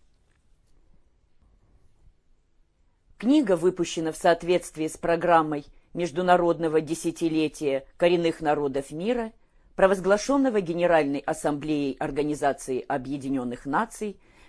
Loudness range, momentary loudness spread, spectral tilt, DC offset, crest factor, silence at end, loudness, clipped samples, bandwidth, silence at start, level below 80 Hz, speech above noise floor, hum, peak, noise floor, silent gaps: 4 LU; 9 LU; -5.5 dB/octave; under 0.1%; 20 dB; 0.35 s; -25 LUFS; under 0.1%; 11 kHz; 3.2 s; -54 dBFS; 39 dB; none; -6 dBFS; -63 dBFS; none